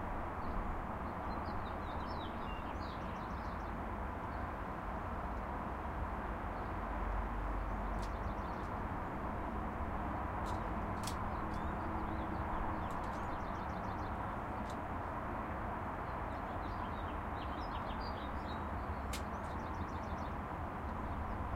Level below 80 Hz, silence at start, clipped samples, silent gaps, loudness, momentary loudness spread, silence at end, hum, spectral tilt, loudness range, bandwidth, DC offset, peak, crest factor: -46 dBFS; 0 s; under 0.1%; none; -42 LUFS; 2 LU; 0 s; none; -6.5 dB/octave; 2 LU; 16 kHz; under 0.1%; -26 dBFS; 14 dB